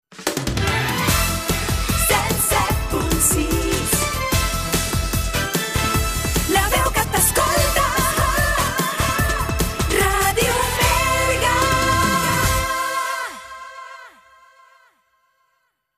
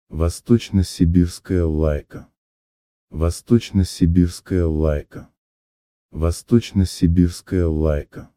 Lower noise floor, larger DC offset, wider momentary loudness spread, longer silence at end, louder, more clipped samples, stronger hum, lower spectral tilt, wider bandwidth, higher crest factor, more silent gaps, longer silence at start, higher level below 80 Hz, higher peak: second, -69 dBFS vs under -90 dBFS; neither; second, 5 LU vs 9 LU; first, 1.9 s vs 0.1 s; about the same, -19 LUFS vs -20 LUFS; neither; neither; second, -3 dB/octave vs -7.5 dB/octave; about the same, 15.5 kHz vs 14.5 kHz; about the same, 16 dB vs 16 dB; second, none vs 2.38-3.07 s, 5.38-6.09 s; about the same, 0.1 s vs 0.1 s; about the same, -28 dBFS vs -30 dBFS; about the same, -4 dBFS vs -2 dBFS